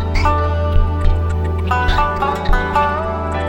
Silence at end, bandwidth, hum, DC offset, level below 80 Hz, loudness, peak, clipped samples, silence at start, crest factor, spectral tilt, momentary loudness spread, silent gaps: 0 s; 8.4 kHz; none; under 0.1%; -18 dBFS; -17 LUFS; 0 dBFS; under 0.1%; 0 s; 14 dB; -7 dB/octave; 3 LU; none